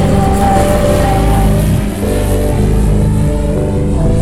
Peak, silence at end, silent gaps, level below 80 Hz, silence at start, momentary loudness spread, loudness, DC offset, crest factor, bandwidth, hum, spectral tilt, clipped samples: 0 dBFS; 0 s; none; -16 dBFS; 0 s; 4 LU; -12 LUFS; under 0.1%; 10 dB; 16 kHz; none; -7 dB/octave; under 0.1%